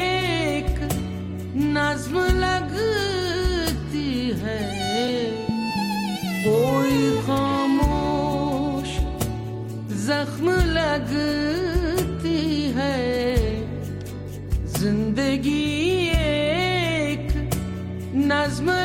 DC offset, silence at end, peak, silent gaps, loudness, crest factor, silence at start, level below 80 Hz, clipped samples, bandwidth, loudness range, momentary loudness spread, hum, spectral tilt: under 0.1%; 0 s; -6 dBFS; none; -23 LUFS; 16 dB; 0 s; -32 dBFS; under 0.1%; 16.5 kHz; 2 LU; 7 LU; none; -5.5 dB/octave